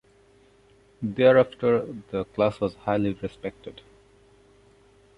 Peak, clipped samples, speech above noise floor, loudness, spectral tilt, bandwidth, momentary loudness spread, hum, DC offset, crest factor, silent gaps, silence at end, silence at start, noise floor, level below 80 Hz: -6 dBFS; under 0.1%; 34 dB; -25 LUFS; -8 dB/octave; 5.4 kHz; 18 LU; none; under 0.1%; 20 dB; none; 1.45 s; 1 s; -58 dBFS; -56 dBFS